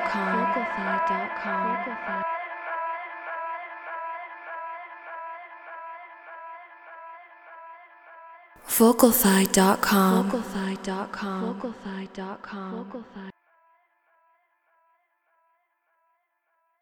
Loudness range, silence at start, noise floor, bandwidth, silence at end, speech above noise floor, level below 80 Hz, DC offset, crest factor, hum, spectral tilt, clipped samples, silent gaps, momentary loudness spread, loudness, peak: 20 LU; 0 s; -74 dBFS; over 20 kHz; 3.5 s; 49 dB; -60 dBFS; under 0.1%; 24 dB; none; -4.5 dB/octave; under 0.1%; none; 25 LU; -25 LUFS; -4 dBFS